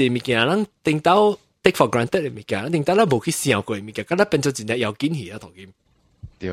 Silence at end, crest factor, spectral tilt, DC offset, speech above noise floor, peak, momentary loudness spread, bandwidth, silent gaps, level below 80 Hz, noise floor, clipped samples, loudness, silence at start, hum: 0 s; 20 dB; -5 dB/octave; under 0.1%; 23 dB; 0 dBFS; 10 LU; 16 kHz; none; -54 dBFS; -44 dBFS; under 0.1%; -20 LUFS; 0 s; none